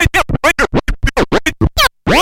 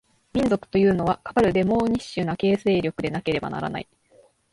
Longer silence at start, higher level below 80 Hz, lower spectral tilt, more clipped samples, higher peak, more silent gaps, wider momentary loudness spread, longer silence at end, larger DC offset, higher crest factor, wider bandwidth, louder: second, 0 s vs 0.35 s; first, -22 dBFS vs -48 dBFS; second, -4 dB/octave vs -7 dB/octave; neither; first, 0 dBFS vs -8 dBFS; neither; second, 4 LU vs 9 LU; second, 0 s vs 0.7 s; neither; about the same, 12 dB vs 16 dB; first, 16.5 kHz vs 11.5 kHz; first, -13 LUFS vs -23 LUFS